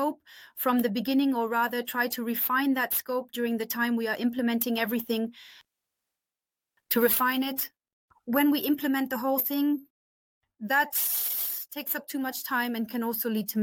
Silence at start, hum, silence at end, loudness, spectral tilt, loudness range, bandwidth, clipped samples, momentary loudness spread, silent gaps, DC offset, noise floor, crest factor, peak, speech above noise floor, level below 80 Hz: 0 s; none; 0 s; -27 LUFS; -3 dB/octave; 3 LU; 17.5 kHz; under 0.1%; 8 LU; 7.93-8.08 s, 9.90-10.41 s; under 0.1%; under -90 dBFS; 18 dB; -10 dBFS; over 62 dB; -74 dBFS